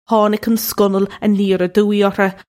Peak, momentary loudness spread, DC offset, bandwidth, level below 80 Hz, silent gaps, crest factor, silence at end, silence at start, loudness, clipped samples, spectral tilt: -2 dBFS; 3 LU; under 0.1%; 16.5 kHz; -52 dBFS; none; 14 dB; 0.15 s; 0.1 s; -15 LUFS; under 0.1%; -5.5 dB/octave